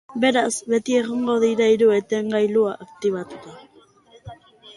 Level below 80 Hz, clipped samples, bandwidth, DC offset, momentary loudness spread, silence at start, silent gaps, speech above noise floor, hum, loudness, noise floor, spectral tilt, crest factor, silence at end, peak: -62 dBFS; under 0.1%; 11.5 kHz; under 0.1%; 9 LU; 0.1 s; none; 33 dB; none; -20 LUFS; -53 dBFS; -4 dB/octave; 16 dB; 0.05 s; -4 dBFS